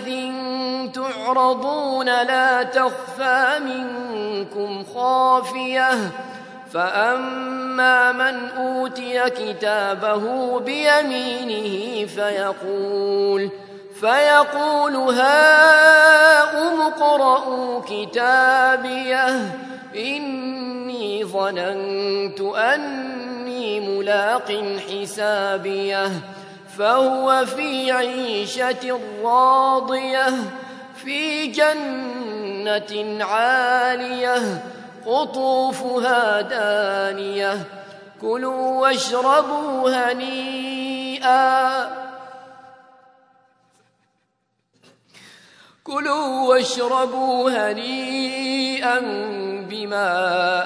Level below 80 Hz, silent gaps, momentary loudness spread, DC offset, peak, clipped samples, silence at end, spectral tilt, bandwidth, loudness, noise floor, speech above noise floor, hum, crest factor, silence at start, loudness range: -80 dBFS; none; 13 LU; under 0.1%; 0 dBFS; under 0.1%; 0 s; -3 dB/octave; 11 kHz; -19 LUFS; -71 dBFS; 52 dB; none; 20 dB; 0 s; 9 LU